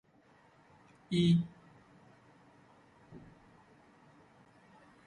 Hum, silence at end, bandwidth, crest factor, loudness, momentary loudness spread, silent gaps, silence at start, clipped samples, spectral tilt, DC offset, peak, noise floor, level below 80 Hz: none; 1.9 s; 9.8 kHz; 22 dB; -31 LUFS; 28 LU; none; 1.1 s; under 0.1%; -7.5 dB/octave; under 0.1%; -18 dBFS; -65 dBFS; -68 dBFS